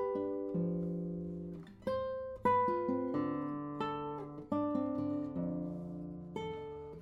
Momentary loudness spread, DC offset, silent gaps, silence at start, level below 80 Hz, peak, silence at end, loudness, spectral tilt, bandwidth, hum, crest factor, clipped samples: 12 LU; under 0.1%; none; 0 s; -64 dBFS; -20 dBFS; 0 s; -38 LUFS; -9 dB/octave; 7.6 kHz; none; 18 dB; under 0.1%